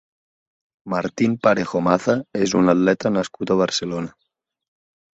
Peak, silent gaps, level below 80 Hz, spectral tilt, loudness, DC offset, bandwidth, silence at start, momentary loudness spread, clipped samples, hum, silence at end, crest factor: -2 dBFS; none; -56 dBFS; -5.5 dB/octave; -20 LUFS; under 0.1%; 8.2 kHz; 0.85 s; 10 LU; under 0.1%; none; 1.05 s; 20 dB